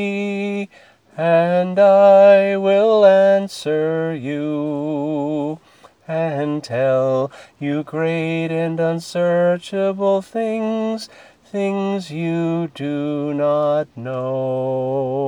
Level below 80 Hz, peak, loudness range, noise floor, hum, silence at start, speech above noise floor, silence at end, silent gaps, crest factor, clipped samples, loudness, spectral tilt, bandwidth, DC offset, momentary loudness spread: -68 dBFS; 0 dBFS; 8 LU; -49 dBFS; none; 0 s; 32 dB; 0 s; none; 16 dB; under 0.1%; -18 LUFS; -7 dB/octave; 11 kHz; under 0.1%; 13 LU